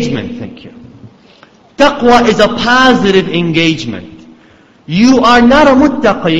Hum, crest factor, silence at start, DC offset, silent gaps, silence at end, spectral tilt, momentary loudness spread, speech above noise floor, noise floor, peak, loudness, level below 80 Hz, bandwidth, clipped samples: none; 10 dB; 0 s; under 0.1%; none; 0 s; -5 dB/octave; 16 LU; 34 dB; -43 dBFS; 0 dBFS; -8 LUFS; -36 dBFS; 8.4 kHz; 0.5%